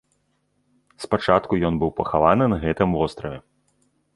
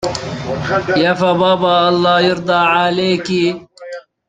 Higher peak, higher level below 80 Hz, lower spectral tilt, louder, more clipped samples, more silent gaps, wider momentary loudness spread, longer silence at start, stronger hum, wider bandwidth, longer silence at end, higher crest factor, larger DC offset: about the same, -2 dBFS vs -2 dBFS; first, -42 dBFS vs -48 dBFS; first, -7.5 dB/octave vs -5.5 dB/octave; second, -21 LUFS vs -14 LUFS; neither; neither; first, 16 LU vs 12 LU; first, 1 s vs 0 s; first, 50 Hz at -50 dBFS vs none; first, 11.5 kHz vs 9.4 kHz; first, 0.75 s vs 0.3 s; first, 22 dB vs 14 dB; neither